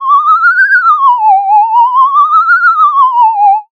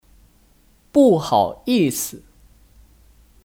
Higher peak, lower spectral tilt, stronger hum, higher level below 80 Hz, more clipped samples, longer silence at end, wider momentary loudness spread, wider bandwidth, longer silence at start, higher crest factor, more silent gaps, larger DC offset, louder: first, 0 dBFS vs -4 dBFS; second, 2 dB/octave vs -5 dB/octave; neither; second, -72 dBFS vs -52 dBFS; neither; second, 0.1 s vs 1.3 s; second, 2 LU vs 9 LU; second, 7 kHz vs 19.5 kHz; second, 0 s vs 0.95 s; second, 6 dB vs 18 dB; neither; neither; first, -6 LUFS vs -18 LUFS